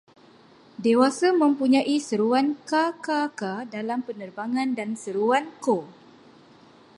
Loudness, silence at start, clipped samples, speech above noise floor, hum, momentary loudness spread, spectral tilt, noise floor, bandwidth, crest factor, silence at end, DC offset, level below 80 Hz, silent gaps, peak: -24 LUFS; 0.8 s; under 0.1%; 30 dB; none; 10 LU; -4.5 dB/octave; -53 dBFS; 11.5 kHz; 18 dB; 1.05 s; under 0.1%; -78 dBFS; none; -6 dBFS